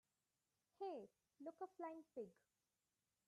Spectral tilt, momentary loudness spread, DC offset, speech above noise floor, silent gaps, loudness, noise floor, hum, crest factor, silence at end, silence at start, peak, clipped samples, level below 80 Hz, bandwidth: -6.5 dB/octave; 7 LU; under 0.1%; over 35 dB; none; -55 LUFS; under -90 dBFS; none; 18 dB; 0.95 s; 0.8 s; -40 dBFS; under 0.1%; under -90 dBFS; 11 kHz